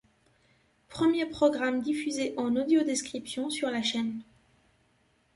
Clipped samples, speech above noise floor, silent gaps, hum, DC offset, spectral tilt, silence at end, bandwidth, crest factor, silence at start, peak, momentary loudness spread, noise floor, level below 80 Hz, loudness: under 0.1%; 40 dB; none; none; under 0.1%; -3.5 dB/octave; 1.15 s; 11.5 kHz; 18 dB; 0.9 s; -12 dBFS; 9 LU; -69 dBFS; -66 dBFS; -29 LUFS